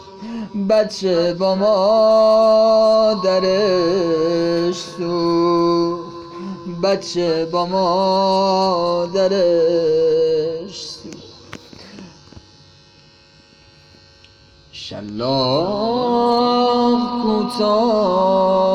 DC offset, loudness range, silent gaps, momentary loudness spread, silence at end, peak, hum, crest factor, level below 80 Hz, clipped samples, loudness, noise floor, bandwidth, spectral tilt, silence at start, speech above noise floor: under 0.1%; 10 LU; none; 17 LU; 0 s; -4 dBFS; none; 12 dB; -52 dBFS; under 0.1%; -16 LUFS; -49 dBFS; 10.5 kHz; -6 dB/octave; 0 s; 33 dB